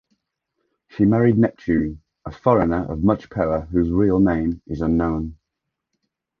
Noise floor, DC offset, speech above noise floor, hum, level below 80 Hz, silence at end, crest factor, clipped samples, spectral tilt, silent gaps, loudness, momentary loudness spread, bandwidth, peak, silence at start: -81 dBFS; under 0.1%; 62 dB; none; -38 dBFS; 1.05 s; 18 dB; under 0.1%; -10.5 dB/octave; none; -20 LUFS; 11 LU; 6.4 kHz; -2 dBFS; 0.95 s